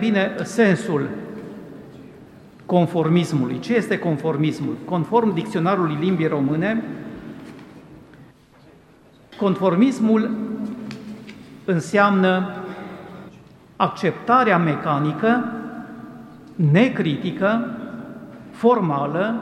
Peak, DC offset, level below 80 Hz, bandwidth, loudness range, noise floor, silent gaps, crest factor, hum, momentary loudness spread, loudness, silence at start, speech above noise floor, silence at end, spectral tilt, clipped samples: -2 dBFS; under 0.1%; -62 dBFS; 12 kHz; 4 LU; -50 dBFS; none; 20 dB; none; 21 LU; -20 LUFS; 0 s; 31 dB; 0 s; -7 dB/octave; under 0.1%